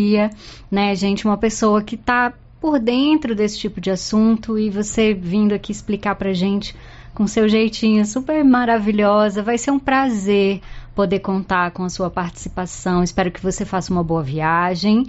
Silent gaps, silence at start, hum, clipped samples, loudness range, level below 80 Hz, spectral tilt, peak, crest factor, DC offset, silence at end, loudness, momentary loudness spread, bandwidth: none; 0 s; none; under 0.1%; 4 LU; -40 dBFS; -5 dB/octave; -6 dBFS; 12 dB; under 0.1%; 0 s; -18 LUFS; 8 LU; 8 kHz